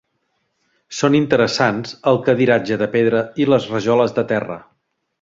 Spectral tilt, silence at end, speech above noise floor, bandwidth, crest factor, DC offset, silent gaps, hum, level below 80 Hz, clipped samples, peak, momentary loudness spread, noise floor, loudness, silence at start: -6 dB/octave; 0.6 s; 53 dB; 7.8 kHz; 18 dB; under 0.1%; none; none; -56 dBFS; under 0.1%; 0 dBFS; 7 LU; -69 dBFS; -17 LUFS; 0.9 s